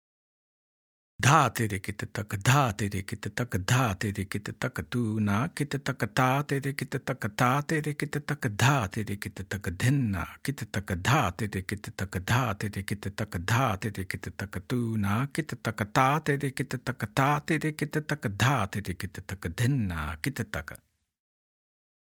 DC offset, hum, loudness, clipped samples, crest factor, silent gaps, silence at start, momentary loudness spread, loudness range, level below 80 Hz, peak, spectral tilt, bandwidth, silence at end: under 0.1%; none; -29 LUFS; under 0.1%; 24 dB; none; 1.2 s; 11 LU; 3 LU; -56 dBFS; -6 dBFS; -5.5 dB/octave; 18.5 kHz; 1.3 s